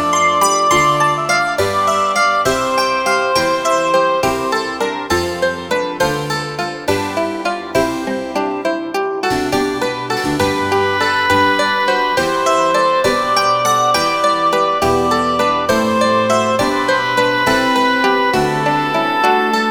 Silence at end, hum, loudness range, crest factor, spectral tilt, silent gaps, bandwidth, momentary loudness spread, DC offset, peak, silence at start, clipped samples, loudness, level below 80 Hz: 0 s; none; 5 LU; 14 dB; -3.5 dB/octave; none; over 20 kHz; 6 LU; under 0.1%; 0 dBFS; 0 s; under 0.1%; -15 LUFS; -44 dBFS